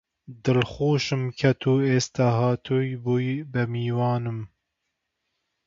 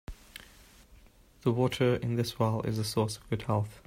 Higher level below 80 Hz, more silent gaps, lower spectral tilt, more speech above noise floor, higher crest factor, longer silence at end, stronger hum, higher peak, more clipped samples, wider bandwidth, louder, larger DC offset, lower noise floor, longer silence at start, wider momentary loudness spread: about the same, -56 dBFS vs -54 dBFS; neither; about the same, -6.5 dB/octave vs -6 dB/octave; first, 56 dB vs 28 dB; about the same, 20 dB vs 18 dB; first, 1.2 s vs 0.1 s; neither; first, -6 dBFS vs -12 dBFS; neither; second, 7.6 kHz vs 16 kHz; first, -24 LUFS vs -30 LUFS; neither; first, -80 dBFS vs -58 dBFS; first, 0.3 s vs 0.1 s; second, 7 LU vs 20 LU